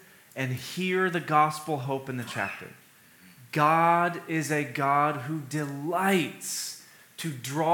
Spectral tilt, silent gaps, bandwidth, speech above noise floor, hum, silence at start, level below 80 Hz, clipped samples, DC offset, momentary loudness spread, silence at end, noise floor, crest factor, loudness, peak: -5 dB/octave; none; 19 kHz; 28 dB; none; 0.35 s; -80 dBFS; under 0.1%; under 0.1%; 13 LU; 0 s; -55 dBFS; 20 dB; -27 LUFS; -8 dBFS